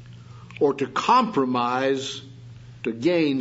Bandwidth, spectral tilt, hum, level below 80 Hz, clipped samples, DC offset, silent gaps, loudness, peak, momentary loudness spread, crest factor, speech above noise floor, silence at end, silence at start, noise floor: 8 kHz; -5.5 dB/octave; none; -62 dBFS; under 0.1%; under 0.1%; none; -23 LUFS; -6 dBFS; 19 LU; 18 dB; 21 dB; 0 s; 0 s; -43 dBFS